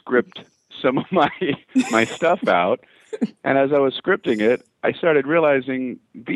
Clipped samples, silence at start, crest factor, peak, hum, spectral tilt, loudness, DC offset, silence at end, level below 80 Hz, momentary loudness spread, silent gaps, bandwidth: under 0.1%; 0.05 s; 18 dB; -2 dBFS; none; -5.5 dB/octave; -20 LUFS; under 0.1%; 0 s; -64 dBFS; 10 LU; none; 12 kHz